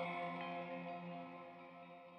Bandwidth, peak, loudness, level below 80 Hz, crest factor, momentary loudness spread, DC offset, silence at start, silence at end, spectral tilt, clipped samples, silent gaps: 8.4 kHz; -30 dBFS; -48 LUFS; -88 dBFS; 18 dB; 12 LU; under 0.1%; 0 s; 0 s; -7.5 dB/octave; under 0.1%; none